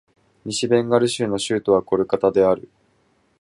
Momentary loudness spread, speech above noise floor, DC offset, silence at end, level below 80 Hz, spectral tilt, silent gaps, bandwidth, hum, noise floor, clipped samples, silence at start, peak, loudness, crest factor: 8 LU; 43 dB; under 0.1%; 0.8 s; -56 dBFS; -5 dB/octave; none; 11.5 kHz; none; -62 dBFS; under 0.1%; 0.45 s; -4 dBFS; -20 LUFS; 18 dB